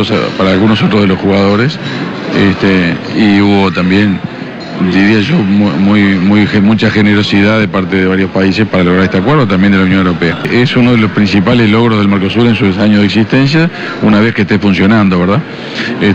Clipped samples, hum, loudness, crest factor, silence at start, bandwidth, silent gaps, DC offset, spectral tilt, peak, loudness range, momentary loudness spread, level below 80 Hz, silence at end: under 0.1%; none; -9 LUFS; 6 dB; 0 s; 7.8 kHz; none; under 0.1%; -7.5 dB/octave; -2 dBFS; 1 LU; 5 LU; -40 dBFS; 0 s